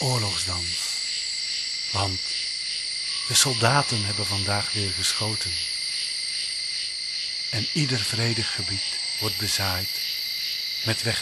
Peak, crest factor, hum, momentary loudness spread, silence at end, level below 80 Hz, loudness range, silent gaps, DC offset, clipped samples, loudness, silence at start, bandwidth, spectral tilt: -2 dBFS; 24 dB; none; 5 LU; 0 s; -56 dBFS; 3 LU; none; under 0.1%; under 0.1%; -24 LUFS; 0 s; 13 kHz; -2.5 dB/octave